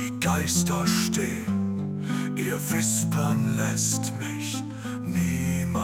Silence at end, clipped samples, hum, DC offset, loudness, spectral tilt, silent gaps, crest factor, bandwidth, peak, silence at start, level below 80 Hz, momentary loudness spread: 0 s; under 0.1%; none; under 0.1%; -26 LUFS; -4.5 dB/octave; none; 16 dB; 18 kHz; -10 dBFS; 0 s; -56 dBFS; 7 LU